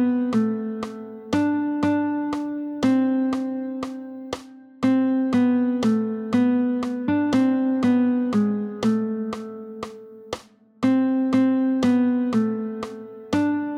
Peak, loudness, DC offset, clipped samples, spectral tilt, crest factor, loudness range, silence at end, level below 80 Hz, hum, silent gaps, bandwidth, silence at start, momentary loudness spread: -8 dBFS; -22 LUFS; under 0.1%; under 0.1%; -7 dB/octave; 14 dB; 4 LU; 0 s; -60 dBFS; none; none; 9.8 kHz; 0 s; 15 LU